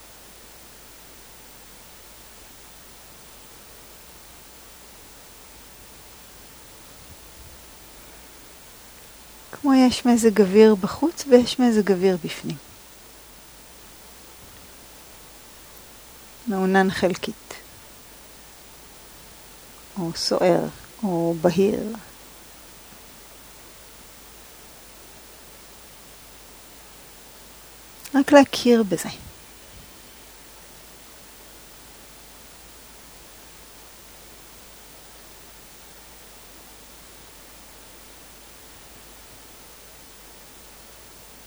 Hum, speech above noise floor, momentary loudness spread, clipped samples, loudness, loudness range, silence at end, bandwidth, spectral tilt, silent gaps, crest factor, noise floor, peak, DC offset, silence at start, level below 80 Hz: none; 27 dB; 25 LU; under 0.1%; -20 LUFS; 23 LU; 12.15 s; over 20 kHz; -5 dB/octave; none; 26 dB; -46 dBFS; 0 dBFS; under 0.1%; 7.1 s; -54 dBFS